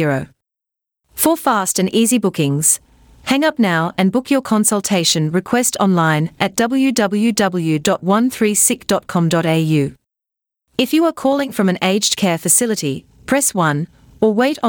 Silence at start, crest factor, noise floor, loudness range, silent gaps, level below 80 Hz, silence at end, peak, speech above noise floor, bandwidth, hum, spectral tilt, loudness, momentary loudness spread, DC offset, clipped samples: 0 s; 16 dB; -84 dBFS; 2 LU; none; -54 dBFS; 0 s; 0 dBFS; 69 dB; 19.5 kHz; none; -4 dB/octave; -16 LUFS; 6 LU; under 0.1%; under 0.1%